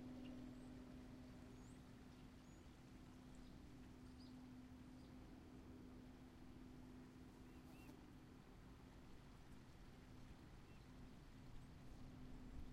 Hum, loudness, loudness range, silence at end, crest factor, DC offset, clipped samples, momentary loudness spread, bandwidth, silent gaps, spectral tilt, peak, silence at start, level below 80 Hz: none; -62 LUFS; 2 LU; 0 s; 16 dB; under 0.1%; under 0.1%; 5 LU; 15 kHz; none; -6.5 dB/octave; -44 dBFS; 0 s; -66 dBFS